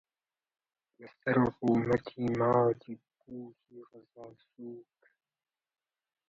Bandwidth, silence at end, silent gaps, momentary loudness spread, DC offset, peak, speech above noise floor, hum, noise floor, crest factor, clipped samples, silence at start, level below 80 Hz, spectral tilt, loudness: 7.2 kHz; 1.5 s; none; 24 LU; under 0.1%; -12 dBFS; over 58 dB; none; under -90 dBFS; 22 dB; under 0.1%; 1 s; -66 dBFS; -9 dB/octave; -30 LUFS